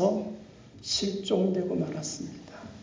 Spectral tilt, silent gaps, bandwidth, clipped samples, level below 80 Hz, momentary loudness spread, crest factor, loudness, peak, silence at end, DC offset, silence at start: -5 dB/octave; none; 7.6 kHz; under 0.1%; -60 dBFS; 18 LU; 18 dB; -30 LUFS; -12 dBFS; 0 s; under 0.1%; 0 s